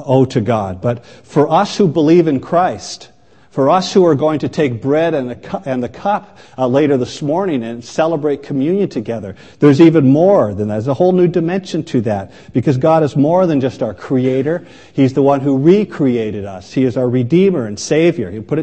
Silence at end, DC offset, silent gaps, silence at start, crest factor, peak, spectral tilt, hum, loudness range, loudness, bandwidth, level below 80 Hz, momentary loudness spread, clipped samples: 0 s; 0.3%; none; 0 s; 14 dB; 0 dBFS; -7 dB/octave; none; 4 LU; -14 LUFS; 8.6 kHz; -52 dBFS; 11 LU; under 0.1%